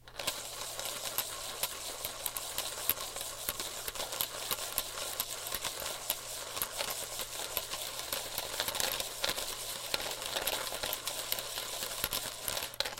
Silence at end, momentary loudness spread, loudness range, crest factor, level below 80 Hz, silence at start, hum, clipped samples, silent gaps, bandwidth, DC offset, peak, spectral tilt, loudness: 0 s; 4 LU; 2 LU; 30 dB; -58 dBFS; 0 s; none; under 0.1%; none; 17 kHz; under 0.1%; -8 dBFS; 0 dB/octave; -35 LUFS